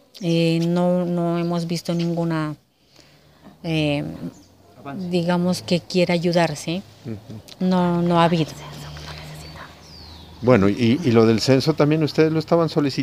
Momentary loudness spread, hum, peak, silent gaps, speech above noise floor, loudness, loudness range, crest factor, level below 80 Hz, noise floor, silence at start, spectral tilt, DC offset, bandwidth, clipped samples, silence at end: 20 LU; none; 0 dBFS; none; 33 dB; -20 LUFS; 7 LU; 20 dB; -52 dBFS; -53 dBFS; 0.15 s; -6.5 dB/octave; under 0.1%; 15 kHz; under 0.1%; 0 s